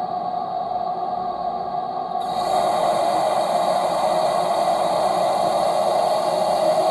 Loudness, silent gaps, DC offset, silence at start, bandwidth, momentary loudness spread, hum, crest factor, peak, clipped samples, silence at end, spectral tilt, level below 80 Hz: -21 LUFS; none; under 0.1%; 0 s; 13 kHz; 6 LU; none; 12 dB; -10 dBFS; under 0.1%; 0 s; -4 dB/octave; -58 dBFS